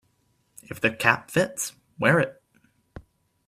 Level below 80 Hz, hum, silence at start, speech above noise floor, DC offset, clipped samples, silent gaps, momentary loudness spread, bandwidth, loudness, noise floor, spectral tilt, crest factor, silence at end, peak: -60 dBFS; none; 0.7 s; 45 dB; under 0.1%; under 0.1%; none; 11 LU; 16 kHz; -24 LUFS; -68 dBFS; -4.5 dB/octave; 24 dB; 0.5 s; -2 dBFS